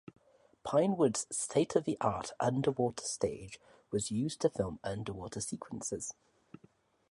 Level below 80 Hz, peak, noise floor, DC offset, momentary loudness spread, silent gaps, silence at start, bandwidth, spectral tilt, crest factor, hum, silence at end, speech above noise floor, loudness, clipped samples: -62 dBFS; -14 dBFS; -67 dBFS; under 0.1%; 10 LU; none; 0.65 s; 11.5 kHz; -5 dB/octave; 20 dB; none; 1 s; 33 dB; -34 LUFS; under 0.1%